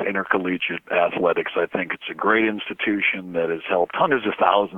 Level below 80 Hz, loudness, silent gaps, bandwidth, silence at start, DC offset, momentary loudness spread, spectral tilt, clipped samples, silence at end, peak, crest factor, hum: -66 dBFS; -22 LUFS; none; 4.1 kHz; 0 s; under 0.1%; 6 LU; -7 dB/octave; under 0.1%; 0 s; -2 dBFS; 20 dB; none